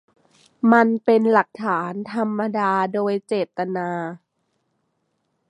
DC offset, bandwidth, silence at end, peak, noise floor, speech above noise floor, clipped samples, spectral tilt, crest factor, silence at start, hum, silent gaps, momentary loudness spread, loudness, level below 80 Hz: under 0.1%; 9.8 kHz; 1.35 s; -2 dBFS; -72 dBFS; 52 dB; under 0.1%; -7.5 dB/octave; 20 dB; 0.65 s; none; none; 10 LU; -21 LUFS; -74 dBFS